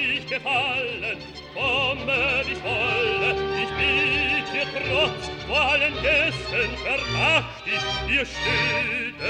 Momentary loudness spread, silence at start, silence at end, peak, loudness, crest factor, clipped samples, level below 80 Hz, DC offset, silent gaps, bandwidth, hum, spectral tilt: 6 LU; 0 s; 0 s; -8 dBFS; -22 LUFS; 16 dB; under 0.1%; -42 dBFS; under 0.1%; none; 12 kHz; none; -4 dB/octave